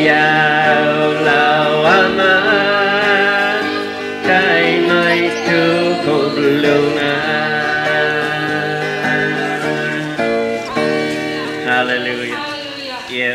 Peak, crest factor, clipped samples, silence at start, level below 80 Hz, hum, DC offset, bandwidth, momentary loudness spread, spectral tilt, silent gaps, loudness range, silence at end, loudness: 0 dBFS; 14 dB; under 0.1%; 0 s; -54 dBFS; none; under 0.1%; 15.5 kHz; 8 LU; -5 dB/octave; none; 6 LU; 0 s; -14 LUFS